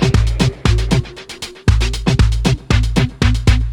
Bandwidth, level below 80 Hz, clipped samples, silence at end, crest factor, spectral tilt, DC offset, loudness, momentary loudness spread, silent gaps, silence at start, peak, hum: 12 kHz; -18 dBFS; under 0.1%; 0 s; 14 dB; -5.5 dB/octave; under 0.1%; -16 LUFS; 4 LU; none; 0 s; 0 dBFS; none